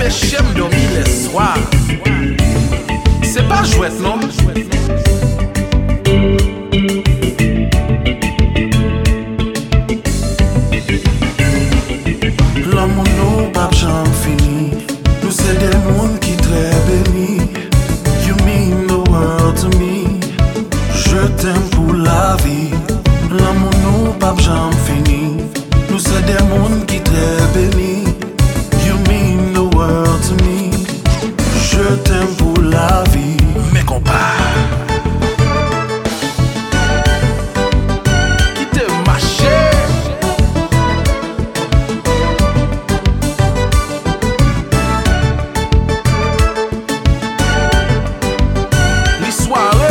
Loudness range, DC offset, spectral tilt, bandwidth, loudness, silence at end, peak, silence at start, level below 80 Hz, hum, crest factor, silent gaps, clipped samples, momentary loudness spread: 2 LU; under 0.1%; -5.5 dB/octave; 17.5 kHz; -14 LUFS; 0 s; 0 dBFS; 0 s; -18 dBFS; none; 12 dB; none; under 0.1%; 5 LU